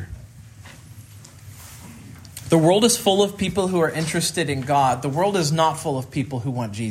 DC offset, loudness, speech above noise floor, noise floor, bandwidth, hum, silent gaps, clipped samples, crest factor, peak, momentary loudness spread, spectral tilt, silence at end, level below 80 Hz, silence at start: under 0.1%; -20 LUFS; 23 dB; -43 dBFS; 16 kHz; none; none; under 0.1%; 18 dB; -4 dBFS; 24 LU; -4.5 dB/octave; 0 s; -52 dBFS; 0 s